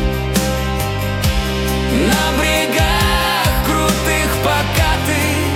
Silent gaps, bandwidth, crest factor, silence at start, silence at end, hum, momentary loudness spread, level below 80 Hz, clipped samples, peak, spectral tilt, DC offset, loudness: none; 18 kHz; 12 dB; 0 s; 0 s; none; 4 LU; -24 dBFS; under 0.1%; -2 dBFS; -4 dB/octave; under 0.1%; -16 LUFS